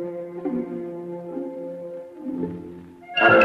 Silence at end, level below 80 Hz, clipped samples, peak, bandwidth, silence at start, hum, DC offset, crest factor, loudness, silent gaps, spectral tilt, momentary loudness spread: 0 s; -64 dBFS; under 0.1%; -4 dBFS; 6.6 kHz; 0 s; none; under 0.1%; 20 dB; -27 LUFS; none; -6.5 dB/octave; 13 LU